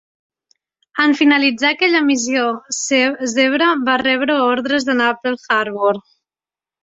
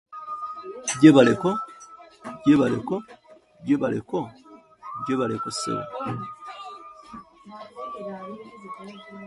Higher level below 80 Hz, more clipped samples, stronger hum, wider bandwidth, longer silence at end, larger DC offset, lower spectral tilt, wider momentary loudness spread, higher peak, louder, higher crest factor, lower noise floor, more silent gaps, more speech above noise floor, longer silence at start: about the same, -62 dBFS vs -62 dBFS; neither; neither; second, 8 kHz vs 11.5 kHz; first, 0.85 s vs 0 s; neither; second, -2 dB/octave vs -5.5 dB/octave; second, 6 LU vs 25 LU; about the same, -2 dBFS vs -2 dBFS; first, -16 LUFS vs -23 LUFS; second, 16 dB vs 24 dB; first, under -90 dBFS vs -52 dBFS; neither; first, over 74 dB vs 29 dB; first, 0.95 s vs 0.1 s